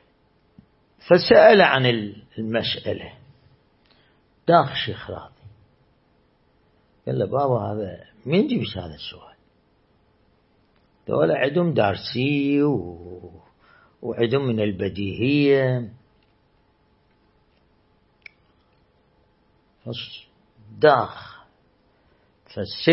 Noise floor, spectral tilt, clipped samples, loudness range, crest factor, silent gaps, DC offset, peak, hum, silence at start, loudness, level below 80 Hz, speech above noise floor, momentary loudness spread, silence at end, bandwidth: -62 dBFS; -10 dB/octave; under 0.1%; 10 LU; 22 dB; none; under 0.1%; -2 dBFS; none; 1.05 s; -21 LUFS; -58 dBFS; 42 dB; 20 LU; 0 s; 5.8 kHz